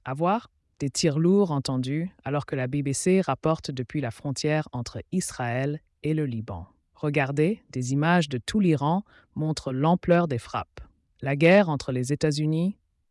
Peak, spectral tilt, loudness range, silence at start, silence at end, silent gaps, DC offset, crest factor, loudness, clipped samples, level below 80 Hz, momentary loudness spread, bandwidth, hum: -8 dBFS; -6 dB/octave; 5 LU; 0.05 s; 0.4 s; none; under 0.1%; 16 dB; -26 LUFS; under 0.1%; -56 dBFS; 11 LU; 12 kHz; none